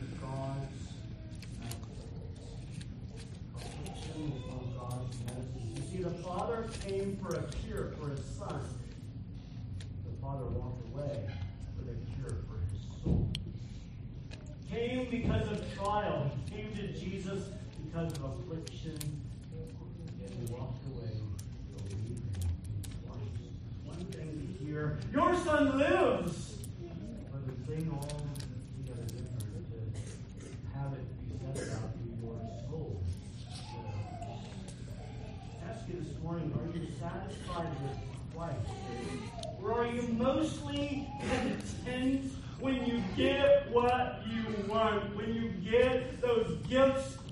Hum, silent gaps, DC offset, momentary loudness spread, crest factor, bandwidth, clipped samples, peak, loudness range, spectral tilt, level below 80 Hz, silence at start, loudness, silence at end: none; none; under 0.1%; 15 LU; 20 dB; 11.5 kHz; under 0.1%; -16 dBFS; 11 LU; -6.5 dB/octave; -50 dBFS; 0 s; -37 LUFS; 0 s